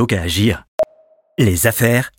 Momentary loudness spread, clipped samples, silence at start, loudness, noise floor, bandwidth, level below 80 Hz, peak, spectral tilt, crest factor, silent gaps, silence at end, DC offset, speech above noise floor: 9 LU; under 0.1%; 0 s; -17 LUFS; -52 dBFS; 17 kHz; -42 dBFS; -2 dBFS; -5 dB/octave; 16 dB; 0.68-0.78 s; 0.1 s; under 0.1%; 37 dB